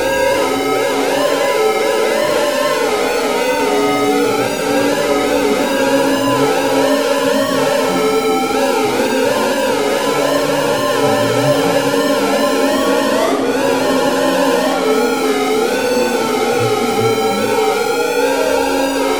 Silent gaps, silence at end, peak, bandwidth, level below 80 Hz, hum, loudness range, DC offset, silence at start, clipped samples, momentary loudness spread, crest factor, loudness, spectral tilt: none; 0 s; 0 dBFS; over 20 kHz; -48 dBFS; none; 1 LU; 0.7%; 0 s; under 0.1%; 1 LU; 14 dB; -14 LUFS; -3.5 dB/octave